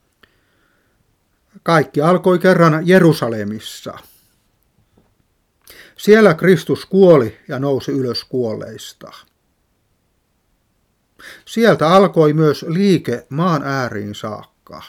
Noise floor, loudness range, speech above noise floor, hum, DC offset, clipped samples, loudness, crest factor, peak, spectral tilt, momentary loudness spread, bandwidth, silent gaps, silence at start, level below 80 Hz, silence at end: -64 dBFS; 10 LU; 50 dB; none; under 0.1%; under 0.1%; -14 LUFS; 16 dB; 0 dBFS; -6.5 dB/octave; 17 LU; 16 kHz; none; 1.65 s; -58 dBFS; 0.05 s